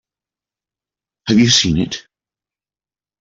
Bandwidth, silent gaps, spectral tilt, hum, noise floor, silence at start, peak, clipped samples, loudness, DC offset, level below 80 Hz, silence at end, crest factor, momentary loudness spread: 7.8 kHz; none; -3.5 dB/octave; none; under -90 dBFS; 1.25 s; -2 dBFS; under 0.1%; -14 LUFS; under 0.1%; -44 dBFS; 1.2 s; 18 dB; 18 LU